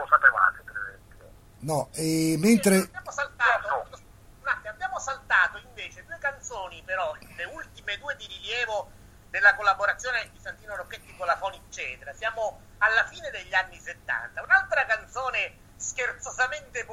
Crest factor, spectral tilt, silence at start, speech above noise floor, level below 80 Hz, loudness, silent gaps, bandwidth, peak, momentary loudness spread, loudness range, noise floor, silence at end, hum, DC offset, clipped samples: 24 dB; -3.5 dB/octave; 0 s; 23 dB; -54 dBFS; -26 LUFS; none; 16.5 kHz; -4 dBFS; 17 LU; 4 LU; -51 dBFS; 0 s; none; under 0.1%; under 0.1%